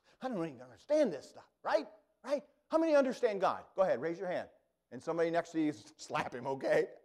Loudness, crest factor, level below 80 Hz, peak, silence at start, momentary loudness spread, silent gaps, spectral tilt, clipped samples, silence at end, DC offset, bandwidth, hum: -35 LUFS; 18 dB; -78 dBFS; -18 dBFS; 0.2 s; 16 LU; none; -5.5 dB/octave; under 0.1%; 0.1 s; under 0.1%; 12 kHz; none